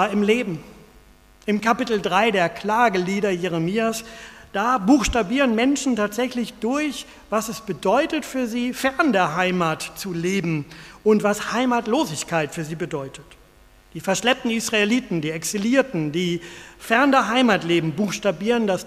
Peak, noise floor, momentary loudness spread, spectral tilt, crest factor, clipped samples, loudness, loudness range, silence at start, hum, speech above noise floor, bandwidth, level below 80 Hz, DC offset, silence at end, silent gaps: -2 dBFS; -51 dBFS; 11 LU; -4.5 dB/octave; 20 dB; under 0.1%; -21 LUFS; 3 LU; 0 s; none; 30 dB; 15.5 kHz; -48 dBFS; under 0.1%; 0 s; none